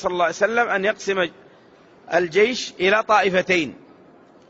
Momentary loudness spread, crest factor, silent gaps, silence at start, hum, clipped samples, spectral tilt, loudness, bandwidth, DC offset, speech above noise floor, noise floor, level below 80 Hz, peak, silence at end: 7 LU; 16 dB; none; 0 s; none; under 0.1%; -4 dB/octave; -20 LUFS; 8 kHz; under 0.1%; 30 dB; -50 dBFS; -60 dBFS; -4 dBFS; 0.75 s